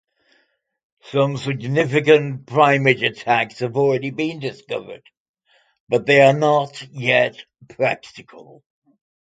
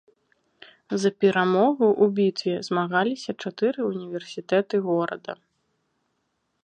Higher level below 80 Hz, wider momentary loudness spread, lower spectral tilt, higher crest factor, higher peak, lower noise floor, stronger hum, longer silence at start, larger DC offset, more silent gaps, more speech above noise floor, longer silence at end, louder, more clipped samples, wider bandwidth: first, -64 dBFS vs -76 dBFS; about the same, 15 LU vs 13 LU; about the same, -6 dB/octave vs -6 dB/octave; about the same, 20 dB vs 18 dB; first, 0 dBFS vs -8 dBFS; second, -66 dBFS vs -75 dBFS; neither; first, 1.05 s vs 0.9 s; neither; first, 5.17-5.34 s, 5.80-5.87 s vs none; second, 47 dB vs 51 dB; second, 0.8 s vs 1.3 s; first, -18 LUFS vs -24 LUFS; neither; about the same, 9.2 kHz vs 9.4 kHz